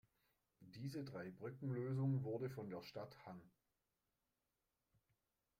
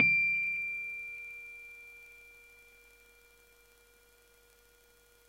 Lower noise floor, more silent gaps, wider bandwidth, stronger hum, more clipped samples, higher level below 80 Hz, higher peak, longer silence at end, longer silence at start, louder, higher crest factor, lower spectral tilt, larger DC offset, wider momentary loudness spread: first, under -90 dBFS vs -64 dBFS; neither; about the same, 15.5 kHz vs 16.5 kHz; neither; neither; second, -82 dBFS vs -70 dBFS; second, -32 dBFS vs -12 dBFS; second, 2.1 s vs 2.95 s; first, 0.6 s vs 0 s; second, -47 LUFS vs -32 LUFS; second, 18 dB vs 24 dB; first, -8.5 dB/octave vs -3.5 dB/octave; neither; second, 17 LU vs 27 LU